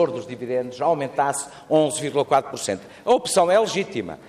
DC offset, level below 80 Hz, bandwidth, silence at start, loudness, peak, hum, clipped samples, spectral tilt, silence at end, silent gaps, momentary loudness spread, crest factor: under 0.1%; -64 dBFS; 15.5 kHz; 0 s; -22 LUFS; -6 dBFS; none; under 0.1%; -4 dB/octave; 0 s; none; 10 LU; 16 dB